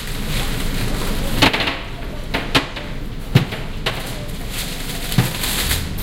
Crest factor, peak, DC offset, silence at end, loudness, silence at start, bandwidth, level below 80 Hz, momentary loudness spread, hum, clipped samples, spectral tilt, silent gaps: 20 dB; 0 dBFS; under 0.1%; 0 s; -21 LUFS; 0 s; 17 kHz; -26 dBFS; 12 LU; none; under 0.1%; -4 dB/octave; none